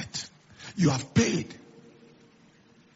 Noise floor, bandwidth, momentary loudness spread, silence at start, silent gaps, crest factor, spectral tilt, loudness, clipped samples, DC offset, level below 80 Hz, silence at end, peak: -59 dBFS; 8 kHz; 20 LU; 0 s; none; 22 dB; -5.5 dB/octave; -27 LUFS; under 0.1%; under 0.1%; -58 dBFS; 1.4 s; -8 dBFS